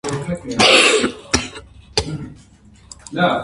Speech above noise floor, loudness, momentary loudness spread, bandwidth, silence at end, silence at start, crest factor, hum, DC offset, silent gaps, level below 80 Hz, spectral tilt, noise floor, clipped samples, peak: 32 dB; -15 LUFS; 20 LU; 11.5 kHz; 0 s; 0.05 s; 18 dB; none; under 0.1%; none; -40 dBFS; -2.5 dB/octave; -47 dBFS; under 0.1%; 0 dBFS